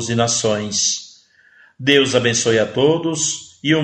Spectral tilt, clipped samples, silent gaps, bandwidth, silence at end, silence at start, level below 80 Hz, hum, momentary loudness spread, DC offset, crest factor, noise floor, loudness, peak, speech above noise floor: -3 dB/octave; under 0.1%; none; 9.2 kHz; 0 s; 0 s; -56 dBFS; none; 7 LU; under 0.1%; 18 dB; -51 dBFS; -17 LUFS; 0 dBFS; 34 dB